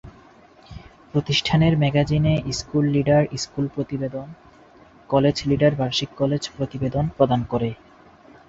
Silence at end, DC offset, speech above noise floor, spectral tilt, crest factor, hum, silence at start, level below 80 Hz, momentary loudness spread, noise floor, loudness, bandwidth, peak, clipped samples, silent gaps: 0.75 s; under 0.1%; 29 dB; -6 dB/octave; 20 dB; none; 0.05 s; -46 dBFS; 10 LU; -50 dBFS; -22 LUFS; 7.8 kHz; -2 dBFS; under 0.1%; none